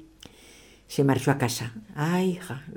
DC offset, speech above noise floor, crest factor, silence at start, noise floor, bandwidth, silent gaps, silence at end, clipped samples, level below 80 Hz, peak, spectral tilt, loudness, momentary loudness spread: under 0.1%; 26 dB; 18 dB; 0 s; -52 dBFS; 19.5 kHz; none; 0 s; under 0.1%; -60 dBFS; -10 dBFS; -5.5 dB/octave; -27 LUFS; 12 LU